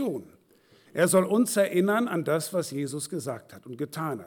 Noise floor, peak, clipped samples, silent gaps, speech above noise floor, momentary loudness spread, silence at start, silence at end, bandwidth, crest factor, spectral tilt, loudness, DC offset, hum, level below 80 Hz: -60 dBFS; -12 dBFS; under 0.1%; none; 34 dB; 15 LU; 0 s; 0 s; 19 kHz; 16 dB; -5 dB/octave; -27 LUFS; under 0.1%; none; -76 dBFS